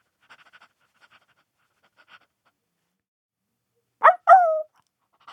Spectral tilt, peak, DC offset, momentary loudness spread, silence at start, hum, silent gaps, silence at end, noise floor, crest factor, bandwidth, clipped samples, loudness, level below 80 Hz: -1 dB/octave; -2 dBFS; under 0.1%; 16 LU; 4 s; none; none; 0.7 s; -78 dBFS; 22 dB; 8.8 kHz; under 0.1%; -17 LUFS; under -90 dBFS